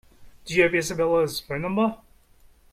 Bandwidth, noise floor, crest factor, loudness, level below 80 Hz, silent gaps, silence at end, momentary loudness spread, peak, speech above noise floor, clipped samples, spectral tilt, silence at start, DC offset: 16 kHz; -55 dBFS; 20 dB; -24 LUFS; -52 dBFS; none; 0.75 s; 8 LU; -6 dBFS; 32 dB; under 0.1%; -4.5 dB/octave; 0.2 s; under 0.1%